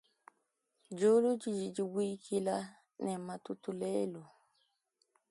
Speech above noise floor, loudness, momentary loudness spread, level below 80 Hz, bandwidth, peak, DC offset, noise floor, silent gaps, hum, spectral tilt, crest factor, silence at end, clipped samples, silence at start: 47 dB; -35 LUFS; 14 LU; -84 dBFS; 11.5 kHz; -20 dBFS; under 0.1%; -81 dBFS; none; none; -6 dB/octave; 18 dB; 1.05 s; under 0.1%; 0.9 s